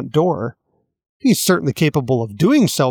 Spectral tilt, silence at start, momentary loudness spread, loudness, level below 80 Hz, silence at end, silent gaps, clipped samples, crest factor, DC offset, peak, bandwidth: -5.5 dB/octave; 0 s; 7 LU; -17 LUFS; -54 dBFS; 0 s; 1.09-1.20 s; under 0.1%; 14 dB; under 0.1%; -4 dBFS; 19 kHz